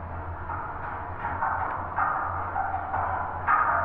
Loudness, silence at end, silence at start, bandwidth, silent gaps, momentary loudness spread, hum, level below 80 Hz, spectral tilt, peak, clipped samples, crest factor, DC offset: -29 LUFS; 0 s; 0 s; 4.2 kHz; none; 10 LU; none; -44 dBFS; -9.5 dB/octave; -10 dBFS; under 0.1%; 18 dB; under 0.1%